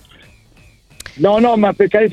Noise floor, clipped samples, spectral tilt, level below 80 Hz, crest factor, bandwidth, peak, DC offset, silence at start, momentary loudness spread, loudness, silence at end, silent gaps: -48 dBFS; under 0.1%; -6.5 dB/octave; -48 dBFS; 16 dB; 12.5 kHz; 0 dBFS; under 0.1%; 1.15 s; 23 LU; -13 LUFS; 0 s; none